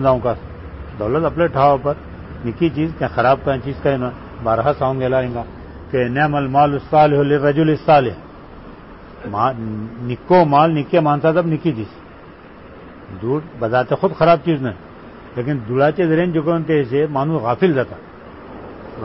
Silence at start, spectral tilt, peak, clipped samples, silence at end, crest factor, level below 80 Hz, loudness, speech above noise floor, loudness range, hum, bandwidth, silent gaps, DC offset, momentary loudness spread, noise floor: 0 s; -12 dB/octave; -2 dBFS; under 0.1%; 0 s; 16 dB; -42 dBFS; -17 LUFS; 23 dB; 4 LU; none; 5.8 kHz; none; 0.1%; 20 LU; -39 dBFS